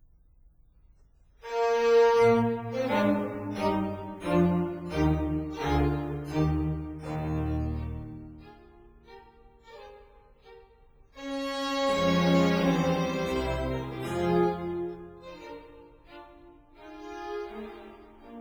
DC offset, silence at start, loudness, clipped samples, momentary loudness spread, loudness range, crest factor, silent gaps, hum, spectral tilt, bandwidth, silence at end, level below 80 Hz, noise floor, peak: under 0.1%; 1.45 s; -28 LUFS; under 0.1%; 22 LU; 15 LU; 18 dB; none; none; -7 dB/octave; over 20 kHz; 0 s; -44 dBFS; -59 dBFS; -10 dBFS